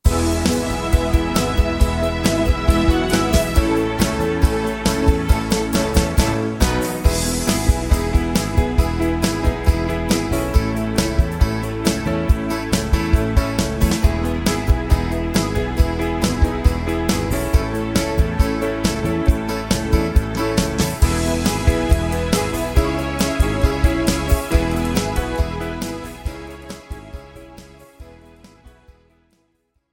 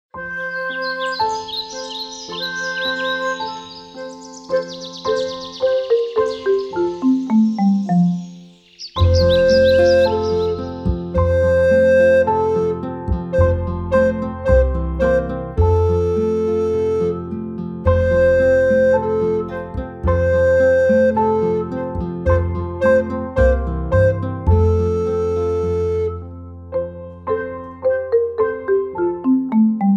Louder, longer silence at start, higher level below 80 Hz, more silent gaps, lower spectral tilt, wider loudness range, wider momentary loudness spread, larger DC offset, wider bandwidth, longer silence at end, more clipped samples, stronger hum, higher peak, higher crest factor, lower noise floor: about the same, -19 LUFS vs -18 LUFS; about the same, 0.05 s vs 0.15 s; first, -22 dBFS vs -30 dBFS; neither; second, -5.5 dB/octave vs -7 dB/octave; second, 4 LU vs 7 LU; second, 4 LU vs 13 LU; neither; first, 17 kHz vs 7.8 kHz; first, 1.25 s vs 0 s; neither; neither; about the same, -2 dBFS vs -2 dBFS; about the same, 16 dB vs 16 dB; first, -66 dBFS vs -41 dBFS